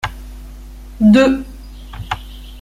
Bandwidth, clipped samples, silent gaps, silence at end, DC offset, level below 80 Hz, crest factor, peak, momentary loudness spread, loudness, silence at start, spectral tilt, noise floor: 14 kHz; under 0.1%; none; 0 s; under 0.1%; -32 dBFS; 16 dB; -2 dBFS; 26 LU; -15 LUFS; 0.05 s; -6.5 dB/octave; -33 dBFS